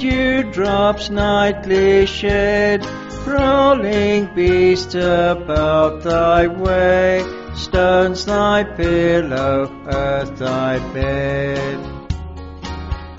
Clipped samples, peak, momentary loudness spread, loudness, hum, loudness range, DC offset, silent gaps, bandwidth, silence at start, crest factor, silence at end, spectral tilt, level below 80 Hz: under 0.1%; -2 dBFS; 13 LU; -16 LUFS; none; 5 LU; under 0.1%; none; 7.8 kHz; 0 s; 16 dB; 0 s; -4.5 dB/octave; -32 dBFS